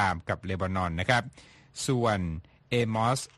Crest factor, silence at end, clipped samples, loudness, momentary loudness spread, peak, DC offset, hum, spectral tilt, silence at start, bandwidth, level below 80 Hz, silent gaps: 22 dB; 0.1 s; under 0.1%; -29 LUFS; 11 LU; -8 dBFS; under 0.1%; none; -5 dB/octave; 0 s; 12.5 kHz; -50 dBFS; none